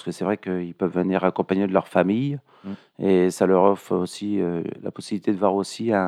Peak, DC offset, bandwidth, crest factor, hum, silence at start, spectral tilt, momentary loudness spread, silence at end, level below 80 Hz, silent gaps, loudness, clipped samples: -4 dBFS; under 0.1%; 13.5 kHz; 18 dB; none; 0.05 s; -7 dB/octave; 12 LU; 0 s; -68 dBFS; none; -23 LUFS; under 0.1%